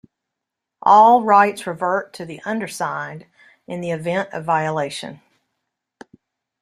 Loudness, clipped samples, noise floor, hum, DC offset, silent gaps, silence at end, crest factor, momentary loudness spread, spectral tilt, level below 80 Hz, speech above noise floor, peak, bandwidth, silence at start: -18 LUFS; under 0.1%; -82 dBFS; none; under 0.1%; none; 1.45 s; 18 dB; 21 LU; -5 dB/octave; -68 dBFS; 64 dB; -2 dBFS; 13.5 kHz; 0.85 s